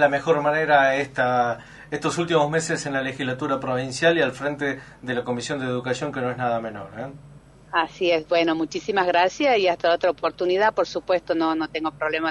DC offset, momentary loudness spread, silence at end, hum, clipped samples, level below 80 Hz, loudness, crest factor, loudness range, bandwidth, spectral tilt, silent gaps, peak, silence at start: under 0.1%; 9 LU; 0 s; none; under 0.1%; -58 dBFS; -23 LUFS; 18 dB; 5 LU; 11.5 kHz; -4.5 dB/octave; none; -6 dBFS; 0 s